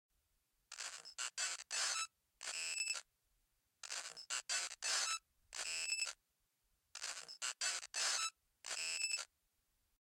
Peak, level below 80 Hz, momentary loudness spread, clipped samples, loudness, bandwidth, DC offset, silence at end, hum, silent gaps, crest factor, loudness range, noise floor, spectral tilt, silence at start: -26 dBFS; -86 dBFS; 11 LU; under 0.1%; -41 LUFS; 16.5 kHz; under 0.1%; 0.9 s; none; none; 20 dB; 1 LU; -84 dBFS; 4.5 dB/octave; 0.7 s